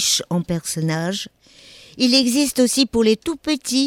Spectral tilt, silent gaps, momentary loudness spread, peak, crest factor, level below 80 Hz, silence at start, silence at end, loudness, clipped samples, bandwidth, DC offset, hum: -3.5 dB/octave; none; 9 LU; -2 dBFS; 18 dB; -52 dBFS; 0 s; 0 s; -19 LUFS; under 0.1%; 17.5 kHz; under 0.1%; none